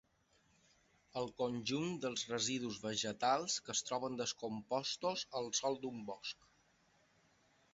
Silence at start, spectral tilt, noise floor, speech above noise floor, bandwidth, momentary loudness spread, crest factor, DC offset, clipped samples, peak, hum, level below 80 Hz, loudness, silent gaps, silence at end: 1.15 s; -3 dB/octave; -75 dBFS; 35 dB; 7.6 kHz; 9 LU; 20 dB; under 0.1%; under 0.1%; -20 dBFS; none; -76 dBFS; -40 LUFS; none; 1.4 s